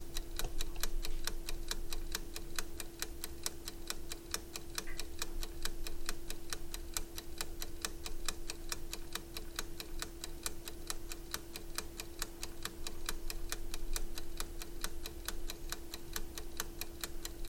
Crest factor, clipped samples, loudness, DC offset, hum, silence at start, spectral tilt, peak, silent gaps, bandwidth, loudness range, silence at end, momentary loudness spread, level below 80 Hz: 22 dB; under 0.1%; -44 LUFS; under 0.1%; none; 0 s; -2 dB/octave; -16 dBFS; none; 17 kHz; 1 LU; 0 s; 3 LU; -44 dBFS